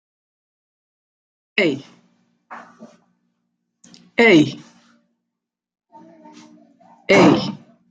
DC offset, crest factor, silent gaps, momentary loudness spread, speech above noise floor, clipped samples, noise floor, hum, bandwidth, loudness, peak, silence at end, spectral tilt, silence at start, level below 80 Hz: under 0.1%; 20 dB; none; 27 LU; 68 dB; under 0.1%; -82 dBFS; none; 9.2 kHz; -16 LUFS; -2 dBFS; 0.35 s; -5.5 dB/octave; 1.55 s; -64 dBFS